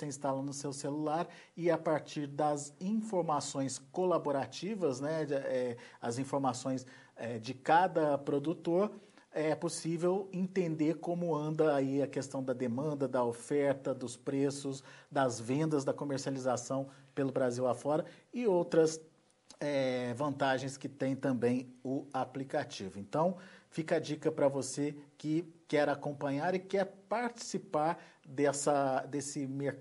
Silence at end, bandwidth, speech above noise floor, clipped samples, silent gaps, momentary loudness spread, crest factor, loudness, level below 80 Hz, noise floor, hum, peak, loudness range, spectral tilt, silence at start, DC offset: 0 s; 11.5 kHz; 28 dB; under 0.1%; none; 9 LU; 18 dB; -35 LUFS; -80 dBFS; -62 dBFS; none; -16 dBFS; 2 LU; -5.5 dB/octave; 0 s; under 0.1%